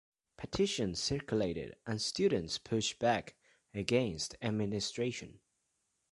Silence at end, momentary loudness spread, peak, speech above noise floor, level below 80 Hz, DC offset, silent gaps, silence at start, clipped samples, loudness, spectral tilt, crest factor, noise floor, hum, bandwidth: 0.8 s; 10 LU; -14 dBFS; 46 dB; -60 dBFS; under 0.1%; none; 0.4 s; under 0.1%; -35 LUFS; -4.5 dB/octave; 22 dB; -81 dBFS; none; 11.5 kHz